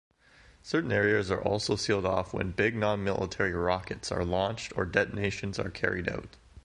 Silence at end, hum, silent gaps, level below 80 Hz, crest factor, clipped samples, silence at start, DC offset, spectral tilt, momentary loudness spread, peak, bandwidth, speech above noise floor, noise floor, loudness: 0.05 s; none; none; -48 dBFS; 22 dB; under 0.1%; 0.65 s; under 0.1%; -5 dB/octave; 7 LU; -10 dBFS; 11.5 kHz; 29 dB; -59 dBFS; -30 LUFS